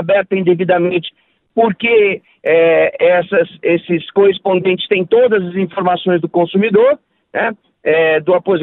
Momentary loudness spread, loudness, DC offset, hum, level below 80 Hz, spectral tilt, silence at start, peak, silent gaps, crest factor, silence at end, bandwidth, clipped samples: 8 LU; -14 LUFS; under 0.1%; none; -58 dBFS; -10 dB/octave; 0 s; -2 dBFS; none; 12 dB; 0 s; 4.1 kHz; under 0.1%